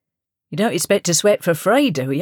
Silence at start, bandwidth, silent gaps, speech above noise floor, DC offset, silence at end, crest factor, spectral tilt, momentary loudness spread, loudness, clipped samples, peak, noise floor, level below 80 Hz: 0.5 s; over 20 kHz; none; 66 dB; under 0.1%; 0 s; 14 dB; -4 dB/octave; 6 LU; -17 LUFS; under 0.1%; -4 dBFS; -84 dBFS; -70 dBFS